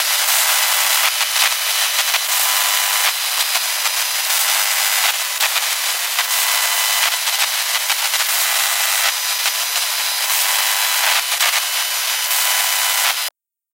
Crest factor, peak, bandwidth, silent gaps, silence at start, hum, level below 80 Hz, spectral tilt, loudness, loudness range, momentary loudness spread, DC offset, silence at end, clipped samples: 18 dB; 0 dBFS; 16 kHz; none; 0 s; none; under -90 dBFS; 9 dB/octave; -15 LUFS; 1 LU; 3 LU; under 0.1%; 0.45 s; under 0.1%